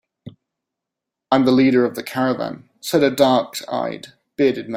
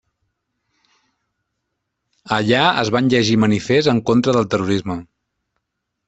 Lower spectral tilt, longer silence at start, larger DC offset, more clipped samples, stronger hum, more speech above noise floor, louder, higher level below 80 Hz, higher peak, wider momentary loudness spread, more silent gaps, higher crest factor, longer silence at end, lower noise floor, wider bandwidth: about the same, -5.5 dB/octave vs -5.5 dB/octave; second, 0.25 s vs 2.25 s; neither; neither; neither; first, 66 dB vs 61 dB; second, -19 LUFS vs -16 LUFS; second, -62 dBFS vs -54 dBFS; about the same, -2 dBFS vs -2 dBFS; first, 14 LU vs 7 LU; neither; about the same, 18 dB vs 18 dB; second, 0 s vs 1.05 s; first, -84 dBFS vs -77 dBFS; first, 16 kHz vs 8.2 kHz